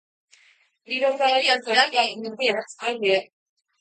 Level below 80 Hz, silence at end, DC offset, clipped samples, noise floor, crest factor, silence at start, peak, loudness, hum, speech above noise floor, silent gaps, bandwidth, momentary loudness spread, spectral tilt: -82 dBFS; 0.55 s; under 0.1%; under 0.1%; -60 dBFS; 20 dB; 0.9 s; -4 dBFS; -22 LUFS; none; 37 dB; none; 9.2 kHz; 8 LU; -2 dB/octave